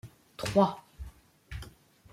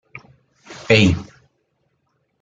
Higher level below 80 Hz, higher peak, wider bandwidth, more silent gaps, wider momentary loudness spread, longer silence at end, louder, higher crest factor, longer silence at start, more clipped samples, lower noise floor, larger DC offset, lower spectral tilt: about the same, -50 dBFS vs -46 dBFS; second, -10 dBFS vs -2 dBFS; first, 15.5 kHz vs 9.2 kHz; neither; second, 23 LU vs 27 LU; second, 0.45 s vs 1.2 s; second, -29 LUFS vs -16 LUFS; about the same, 24 dB vs 20 dB; about the same, 0.05 s vs 0.15 s; neither; second, -53 dBFS vs -69 dBFS; neither; about the same, -6 dB/octave vs -5.5 dB/octave